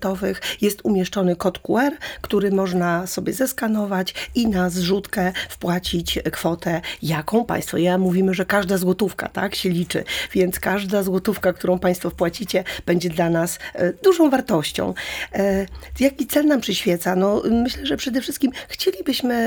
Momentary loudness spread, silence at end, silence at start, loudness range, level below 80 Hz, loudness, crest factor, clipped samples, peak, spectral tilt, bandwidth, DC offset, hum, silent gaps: 6 LU; 0 s; 0 s; 2 LU; -44 dBFS; -21 LUFS; 16 dB; under 0.1%; -4 dBFS; -5 dB/octave; over 20 kHz; under 0.1%; none; none